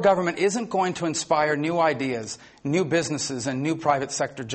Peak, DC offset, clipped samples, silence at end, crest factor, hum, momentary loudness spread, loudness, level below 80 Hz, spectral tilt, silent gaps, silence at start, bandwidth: -8 dBFS; under 0.1%; under 0.1%; 0 s; 16 dB; none; 6 LU; -24 LUFS; -64 dBFS; -4.5 dB/octave; none; 0 s; 8.8 kHz